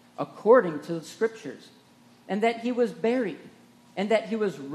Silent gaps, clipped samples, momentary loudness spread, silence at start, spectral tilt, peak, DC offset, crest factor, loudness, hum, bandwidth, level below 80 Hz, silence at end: none; under 0.1%; 20 LU; 0.2 s; -6 dB/octave; -6 dBFS; under 0.1%; 20 dB; -26 LUFS; 60 Hz at -60 dBFS; 12.5 kHz; -82 dBFS; 0 s